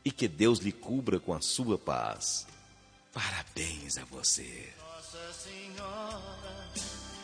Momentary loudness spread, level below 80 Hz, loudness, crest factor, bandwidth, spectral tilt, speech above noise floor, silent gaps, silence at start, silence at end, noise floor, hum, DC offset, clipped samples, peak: 16 LU; -56 dBFS; -33 LUFS; 22 dB; 10.5 kHz; -3 dB/octave; 25 dB; none; 0.05 s; 0 s; -59 dBFS; none; under 0.1%; under 0.1%; -14 dBFS